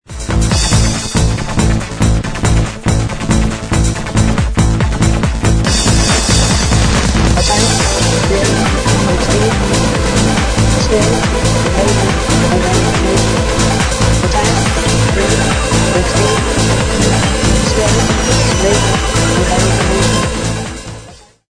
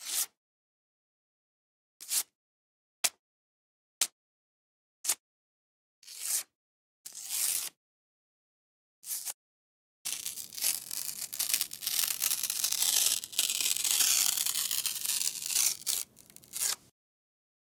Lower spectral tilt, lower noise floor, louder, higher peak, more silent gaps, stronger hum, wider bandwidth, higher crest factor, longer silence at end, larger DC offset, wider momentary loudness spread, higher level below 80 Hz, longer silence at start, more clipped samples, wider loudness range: first, -4.5 dB/octave vs 3 dB/octave; second, -35 dBFS vs -56 dBFS; first, -12 LUFS vs -30 LUFS; first, 0 dBFS vs -6 dBFS; second, none vs 0.37-2.00 s, 2.35-3.04 s, 3.19-4.01 s, 4.12-5.04 s, 5.20-6.02 s, 6.55-7.04 s, 7.77-9.03 s, 9.34-10.05 s; neither; second, 11 kHz vs 19 kHz; second, 12 dB vs 30 dB; second, 0.35 s vs 0.95 s; neither; second, 4 LU vs 15 LU; first, -18 dBFS vs -82 dBFS; about the same, 0.1 s vs 0 s; neither; second, 3 LU vs 11 LU